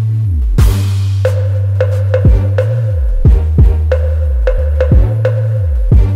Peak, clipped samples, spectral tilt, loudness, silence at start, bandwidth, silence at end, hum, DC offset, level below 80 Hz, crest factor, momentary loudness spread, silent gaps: 0 dBFS; under 0.1%; -8 dB/octave; -12 LUFS; 0 s; 14 kHz; 0 s; none; under 0.1%; -12 dBFS; 10 dB; 4 LU; none